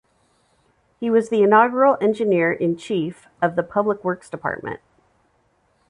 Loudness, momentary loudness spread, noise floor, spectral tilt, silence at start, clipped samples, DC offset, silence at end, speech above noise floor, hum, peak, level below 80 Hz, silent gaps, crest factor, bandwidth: -20 LUFS; 14 LU; -64 dBFS; -7 dB/octave; 1 s; under 0.1%; under 0.1%; 1.15 s; 44 dB; none; -2 dBFS; -62 dBFS; none; 18 dB; 11 kHz